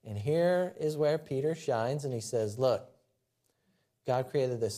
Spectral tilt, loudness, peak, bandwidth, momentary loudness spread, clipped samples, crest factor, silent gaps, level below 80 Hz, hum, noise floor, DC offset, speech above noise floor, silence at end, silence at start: -6 dB/octave; -31 LUFS; -16 dBFS; 15 kHz; 5 LU; under 0.1%; 16 dB; none; -76 dBFS; none; -78 dBFS; under 0.1%; 47 dB; 0 s; 0.05 s